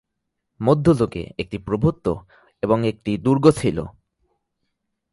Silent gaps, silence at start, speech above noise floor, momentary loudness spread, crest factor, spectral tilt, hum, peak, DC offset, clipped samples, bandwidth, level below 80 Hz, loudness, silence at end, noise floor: none; 0.6 s; 58 dB; 13 LU; 20 dB; -7.5 dB/octave; none; -2 dBFS; under 0.1%; under 0.1%; 11.5 kHz; -46 dBFS; -21 LUFS; 1.2 s; -78 dBFS